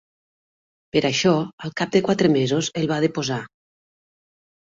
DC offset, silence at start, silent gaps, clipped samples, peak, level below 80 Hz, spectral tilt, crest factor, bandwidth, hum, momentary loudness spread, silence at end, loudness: under 0.1%; 0.95 s; 1.53-1.58 s; under 0.1%; -4 dBFS; -60 dBFS; -5 dB/octave; 18 dB; 7.8 kHz; none; 9 LU; 1.2 s; -21 LUFS